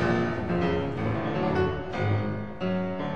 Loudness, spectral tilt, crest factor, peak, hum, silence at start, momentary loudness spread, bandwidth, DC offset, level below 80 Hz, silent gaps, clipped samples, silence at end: -28 LUFS; -8 dB/octave; 14 dB; -12 dBFS; none; 0 s; 4 LU; 8 kHz; 0.8%; -46 dBFS; none; under 0.1%; 0 s